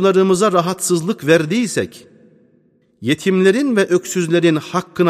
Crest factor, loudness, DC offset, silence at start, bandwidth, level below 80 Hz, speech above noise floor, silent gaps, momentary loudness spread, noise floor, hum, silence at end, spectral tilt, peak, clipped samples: 16 dB; -16 LUFS; under 0.1%; 0 s; 15 kHz; -62 dBFS; 41 dB; none; 8 LU; -56 dBFS; none; 0 s; -5 dB/octave; 0 dBFS; under 0.1%